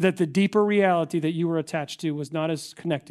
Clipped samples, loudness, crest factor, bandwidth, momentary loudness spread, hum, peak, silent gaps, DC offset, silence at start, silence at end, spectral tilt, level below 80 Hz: under 0.1%; -25 LUFS; 16 dB; 13 kHz; 9 LU; none; -8 dBFS; none; under 0.1%; 0 s; 0.1 s; -6.5 dB/octave; -70 dBFS